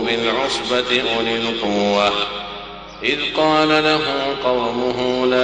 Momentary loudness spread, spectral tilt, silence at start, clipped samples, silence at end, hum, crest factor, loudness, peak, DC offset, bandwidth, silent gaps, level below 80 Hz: 8 LU; -4 dB/octave; 0 s; under 0.1%; 0 s; none; 16 dB; -18 LUFS; -4 dBFS; under 0.1%; 10.5 kHz; none; -48 dBFS